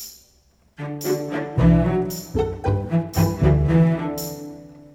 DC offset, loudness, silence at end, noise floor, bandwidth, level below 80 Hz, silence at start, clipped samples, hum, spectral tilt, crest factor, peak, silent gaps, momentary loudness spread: under 0.1%; -21 LUFS; 0.15 s; -58 dBFS; over 20 kHz; -32 dBFS; 0 s; under 0.1%; none; -7 dB/octave; 18 dB; -4 dBFS; none; 18 LU